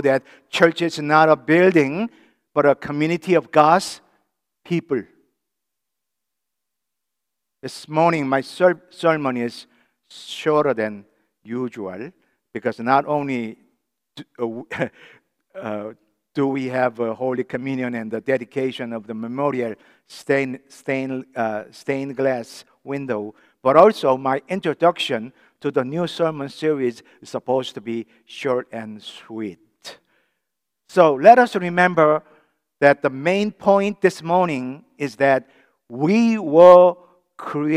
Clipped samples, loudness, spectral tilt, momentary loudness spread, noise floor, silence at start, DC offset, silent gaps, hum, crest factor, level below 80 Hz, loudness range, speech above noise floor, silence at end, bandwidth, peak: under 0.1%; -19 LUFS; -6 dB/octave; 18 LU; -83 dBFS; 0 s; under 0.1%; none; none; 20 dB; -70 dBFS; 11 LU; 64 dB; 0 s; 12.5 kHz; 0 dBFS